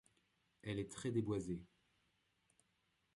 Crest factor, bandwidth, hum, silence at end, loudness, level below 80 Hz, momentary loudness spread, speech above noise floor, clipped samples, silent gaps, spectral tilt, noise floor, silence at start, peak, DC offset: 20 dB; 11.5 kHz; none; 1.5 s; -44 LUFS; -70 dBFS; 9 LU; 40 dB; under 0.1%; none; -6.5 dB/octave; -82 dBFS; 0.65 s; -26 dBFS; under 0.1%